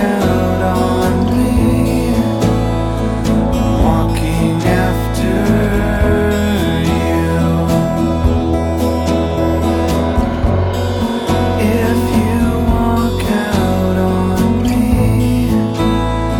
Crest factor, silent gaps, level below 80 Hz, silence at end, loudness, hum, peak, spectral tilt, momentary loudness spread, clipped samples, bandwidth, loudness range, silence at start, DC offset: 12 dB; none; -22 dBFS; 0 s; -14 LUFS; none; 0 dBFS; -7 dB/octave; 3 LU; under 0.1%; 17.5 kHz; 1 LU; 0 s; under 0.1%